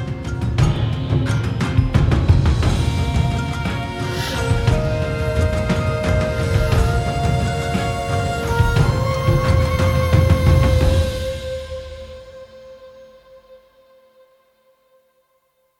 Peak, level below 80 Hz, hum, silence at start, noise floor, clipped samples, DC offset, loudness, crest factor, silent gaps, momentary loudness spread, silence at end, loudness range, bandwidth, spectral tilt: 0 dBFS; -26 dBFS; none; 0 s; -64 dBFS; under 0.1%; under 0.1%; -19 LUFS; 18 dB; none; 10 LU; 2.25 s; 6 LU; 16.5 kHz; -6.5 dB/octave